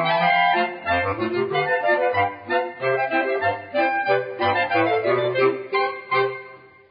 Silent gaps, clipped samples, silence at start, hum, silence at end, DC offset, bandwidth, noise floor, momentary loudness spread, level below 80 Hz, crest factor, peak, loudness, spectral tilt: none; under 0.1%; 0 s; none; 0.35 s; under 0.1%; 5.2 kHz; -44 dBFS; 5 LU; -54 dBFS; 14 dB; -8 dBFS; -21 LUFS; -9.5 dB/octave